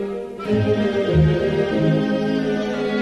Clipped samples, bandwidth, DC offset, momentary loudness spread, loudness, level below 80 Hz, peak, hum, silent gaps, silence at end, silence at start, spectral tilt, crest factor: under 0.1%; 8.6 kHz; under 0.1%; 5 LU; -20 LUFS; -36 dBFS; -6 dBFS; none; none; 0 s; 0 s; -8 dB/octave; 14 dB